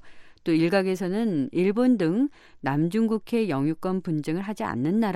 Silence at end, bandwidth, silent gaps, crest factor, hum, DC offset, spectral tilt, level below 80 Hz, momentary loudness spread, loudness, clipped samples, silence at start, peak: 0 s; 14 kHz; none; 14 dB; none; under 0.1%; -7.5 dB/octave; -60 dBFS; 7 LU; -25 LUFS; under 0.1%; 0.05 s; -12 dBFS